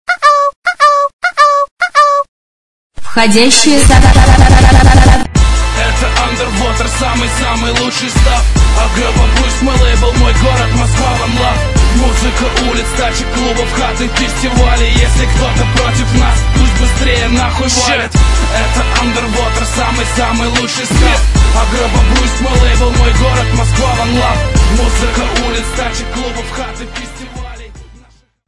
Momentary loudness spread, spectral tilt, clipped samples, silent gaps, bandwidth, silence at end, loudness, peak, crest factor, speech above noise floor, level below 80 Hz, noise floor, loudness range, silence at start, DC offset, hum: 8 LU; -4.5 dB/octave; 1%; 0.56-0.62 s, 1.13-1.19 s, 1.71-1.77 s, 2.28-2.90 s; 12 kHz; 0.5 s; -10 LUFS; 0 dBFS; 10 dB; 35 dB; -12 dBFS; -44 dBFS; 5 LU; 0.05 s; under 0.1%; none